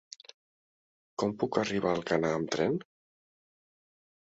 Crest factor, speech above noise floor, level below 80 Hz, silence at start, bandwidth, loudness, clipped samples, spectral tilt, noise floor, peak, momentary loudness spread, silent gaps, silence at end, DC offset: 22 dB; over 60 dB; -66 dBFS; 1.2 s; 8 kHz; -31 LUFS; under 0.1%; -5.5 dB/octave; under -90 dBFS; -12 dBFS; 14 LU; none; 1.4 s; under 0.1%